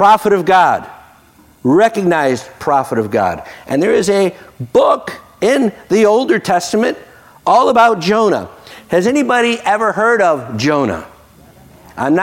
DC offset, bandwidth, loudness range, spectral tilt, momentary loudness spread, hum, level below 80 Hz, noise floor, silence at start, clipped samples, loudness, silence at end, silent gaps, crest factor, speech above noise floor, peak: under 0.1%; 16.5 kHz; 2 LU; -5 dB/octave; 10 LU; none; -54 dBFS; -46 dBFS; 0 s; under 0.1%; -13 LUFS; 0 s; none; 12 dB; 34 dB; -2 dBFS